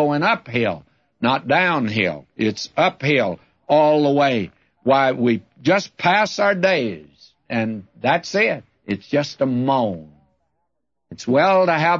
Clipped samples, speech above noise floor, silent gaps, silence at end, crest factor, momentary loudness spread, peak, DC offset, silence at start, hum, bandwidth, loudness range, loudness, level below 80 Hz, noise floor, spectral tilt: under 0.1%; 58 dB; none; 0 s; 16 dB; 11 LU; -4 dBFS; under 0.1%; 0 s; none; 7.6 kHz; 4 LU; -19 LUFS; -62 dBFS; -76 dBFS; -5.5 dB/octave